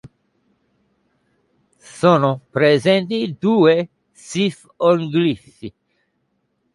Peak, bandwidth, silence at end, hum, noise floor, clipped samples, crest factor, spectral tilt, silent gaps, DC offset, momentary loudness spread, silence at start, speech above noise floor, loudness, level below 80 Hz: 0 dBFS; 11.5 kHz; 1.05 s; none; -69 dBFS; under 0.1%; 20 dB; -6.5 dB/octave; none; under 0.1%; 16 LU; 1.95 s; 52 dB; -17 LUFS; -62 dBFS